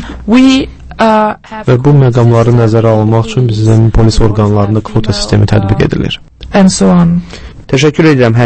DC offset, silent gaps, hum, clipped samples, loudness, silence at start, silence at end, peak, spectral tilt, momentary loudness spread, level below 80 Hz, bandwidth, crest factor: under 0.1%; none; none; 1%; -9 LUFS; 0 s; 0 s; 0 dBFS; -6.5 dB/octave; 8 LU; -22 dBFS; 8.8 kHz; 8 dB